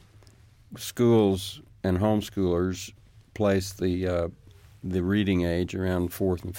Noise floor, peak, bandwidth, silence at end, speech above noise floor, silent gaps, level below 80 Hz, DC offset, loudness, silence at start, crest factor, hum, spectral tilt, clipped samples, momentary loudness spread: -54 dBFS; -10 dBFS; 17 kHz; 0 s; 29 dB; none; -50 dBFS; under 0.1%; -26 LUFS; 0.7 s; 16 dB; none; -6.5 dB/octave; under 0.1%; 15 LU